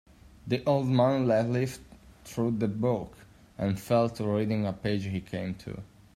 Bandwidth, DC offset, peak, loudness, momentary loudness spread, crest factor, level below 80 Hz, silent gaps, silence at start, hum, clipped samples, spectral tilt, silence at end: 15.5 kHz; under 0.1%; -10 dBFS; -29 LUFS; 15 LU; 18 dB; -58 dBFS; none; 0.45 s; none; under 0.1%; -7.5 dB/octave; 0.3 s